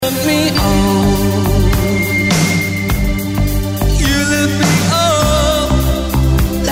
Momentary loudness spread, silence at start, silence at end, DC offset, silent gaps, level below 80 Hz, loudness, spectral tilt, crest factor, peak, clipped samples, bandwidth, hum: 4 LU; 0 s; 0 s; under 0.1%; none; -20 dBFS; -13 LUFS; -5 dB/octave; 12 dB; -2 dBFS; under 0.1%; 16.5 kHz; none